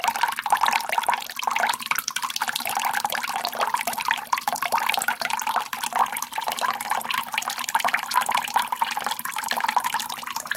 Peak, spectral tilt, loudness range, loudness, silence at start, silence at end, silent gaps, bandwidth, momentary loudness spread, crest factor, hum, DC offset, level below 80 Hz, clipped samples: -4 dBFS; 0.5 dB/octave; 1 LU; -25 LUFS; 0 s; 0 s; none; 17 kHz; 5 LU; 22 dB; none; under 0.1%; -68 dBFS; under 0.1%